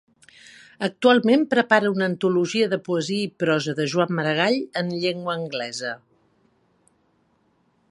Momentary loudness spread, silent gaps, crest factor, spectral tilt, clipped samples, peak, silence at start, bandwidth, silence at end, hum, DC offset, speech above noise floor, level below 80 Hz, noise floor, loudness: 11 LU; none; 22 dB; -5 dB/octave; under 0.1%; -2 dBFS; 0.8 s; 11.5 kHz; 1.95 s; none; under 0.1%; 43 dB; -72 dBFS; -65 dBFS; -22 LUFS